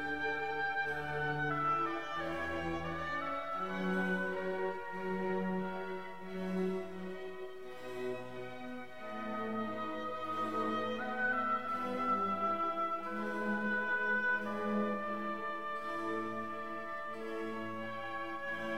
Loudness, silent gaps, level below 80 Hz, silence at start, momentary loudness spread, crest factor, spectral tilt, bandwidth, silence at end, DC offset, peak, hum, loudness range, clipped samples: -37 LUFS; none; -66 dBFS; 0 s; 10 LU; 14 dB; -6.5 dB/octave; 16 kHz; 0 s; 0.3%; -24 dBFS; none; 7 LU; under 0.1%